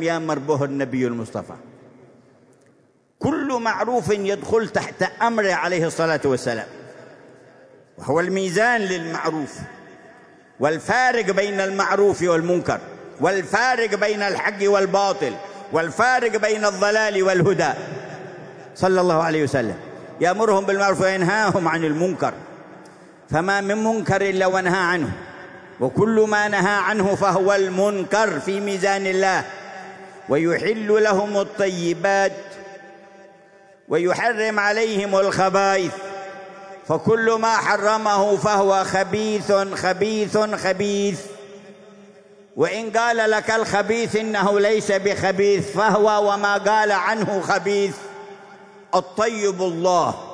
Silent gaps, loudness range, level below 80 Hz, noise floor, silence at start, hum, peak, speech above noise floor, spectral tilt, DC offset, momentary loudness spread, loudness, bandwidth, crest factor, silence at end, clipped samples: none; 4 LU; -60 dBFS; -58 dBFS; 0 s; none; -4 dBFS; 39 dB; -4.5 dB/octave; under 0.1%; 15 LU; -20 LUFS; 11 kHz; 16 dB; 0 s; under 0.1%